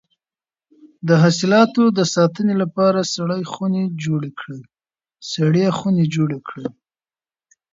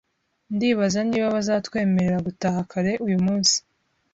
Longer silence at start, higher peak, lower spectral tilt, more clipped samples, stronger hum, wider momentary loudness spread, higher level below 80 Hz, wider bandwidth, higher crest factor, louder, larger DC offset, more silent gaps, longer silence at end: first, 0.85 s vs 0.5 s; first, -2 dBFS vs -6 dBFS; first, -6 dB/octave vs -4.5 dB/octave; neither; neither; first, 16 LU vs 6 LU; second, -62 dBFS vs -56 dBFS; about the same, 7.8 kHz vs 8 kHz; about the same, 18 dB vs 16 dB; first, -18 LUFS vs -22 LUFS; neither; neither; first, 1 s vs 0.55 s